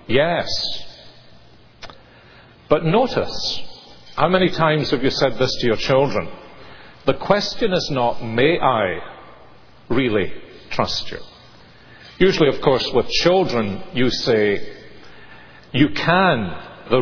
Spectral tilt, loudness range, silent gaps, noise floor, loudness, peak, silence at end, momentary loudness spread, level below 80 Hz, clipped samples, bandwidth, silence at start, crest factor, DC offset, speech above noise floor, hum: -5.5 dB/octave; 5 LU; none; -48 dBFS; -19 LUFS; 0 dBFS; 0 s; 18 LU; -42 dBFS; under 0.1%; 5.4 kHz; 0.1 s; 20 dB; under 0.1%; 30 dB; none